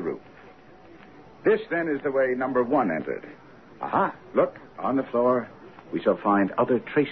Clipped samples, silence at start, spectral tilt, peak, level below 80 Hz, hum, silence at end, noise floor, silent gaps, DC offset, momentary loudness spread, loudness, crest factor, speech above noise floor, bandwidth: under 0.1%; 0 s; -9.5 dB/octave; -8 dBFS; -64 dBFS; none; 0 s; -50 dBFS; none; 0.1%; 12 LU; -25 LUFS; 18 dB; 25 dB; 6 kHz